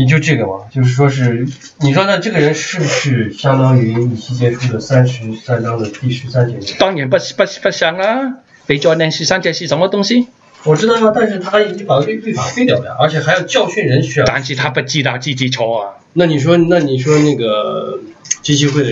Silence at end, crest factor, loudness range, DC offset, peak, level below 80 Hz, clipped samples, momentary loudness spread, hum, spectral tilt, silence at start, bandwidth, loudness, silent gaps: 0 s; 14 dB; 2 LU; under 0.1%; 0 dBFS; -50 dBFS; under 0.1%; 7 LU; none; -5.5 dB/octave; 0 s; 7.8 kHz; -14 LUFS; none